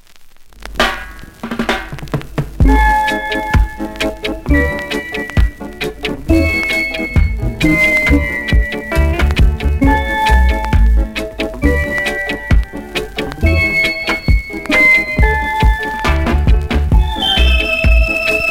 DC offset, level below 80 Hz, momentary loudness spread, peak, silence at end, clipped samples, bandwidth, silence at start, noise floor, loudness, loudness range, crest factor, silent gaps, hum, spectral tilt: under 0.1%; -16 dBFS; 10 LU; 0 dBFS; 0 s; under 0.1%; 16 kHz; 0.1 s; -37 dBFS; -14 LUFS; 4 LU; 14 dB; none; none; -5.5 dB/octave